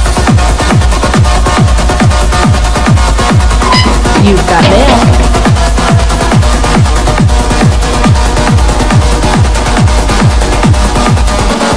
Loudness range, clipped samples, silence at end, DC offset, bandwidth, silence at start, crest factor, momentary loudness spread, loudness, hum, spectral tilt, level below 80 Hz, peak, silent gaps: 1 LU; 4%; 0 s; 4%; 11 kHz; 0 s; 6 dB; 2 LU; -8 LUFS; none; -5 dB/octave; -10 dBFS; 0 dBFS; none